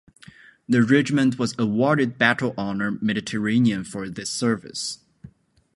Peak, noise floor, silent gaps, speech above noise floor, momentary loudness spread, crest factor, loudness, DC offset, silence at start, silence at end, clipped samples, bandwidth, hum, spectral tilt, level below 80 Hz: -2 dBFS; -51 dBFS; none; 30 dB; 11 LU; 20 dB; -22 LUFS; under 0.1%; 0.7 s; 0.5 s; under 0.1%; 11.5 kHz; none; -5 dB/octave; -60 dBFS